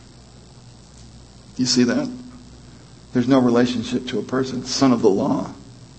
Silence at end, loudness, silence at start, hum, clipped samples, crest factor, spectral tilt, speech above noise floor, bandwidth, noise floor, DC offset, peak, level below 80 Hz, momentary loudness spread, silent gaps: 0.15 s; -20 LUFS; 0.55 s; none; under 0.1%; 20 dB; -5 dB/octave; 26 dB; 8.6 kHz; -45 dBFS; under 0.1%; -2 dBFS; -50 dBFS; 18 LU; none